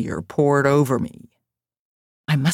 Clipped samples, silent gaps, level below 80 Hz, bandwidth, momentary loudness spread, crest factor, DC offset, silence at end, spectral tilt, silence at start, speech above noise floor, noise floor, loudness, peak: under 0.1%; 1.79-2.24 s; -54 dBFS; 16 kHz; 13 LU; 16 dB; under 0.1%; 0 s; -6.5 dB/octave; 0 s; 58 dB; -77 dBFS; -20 LUFS; -4 dBFS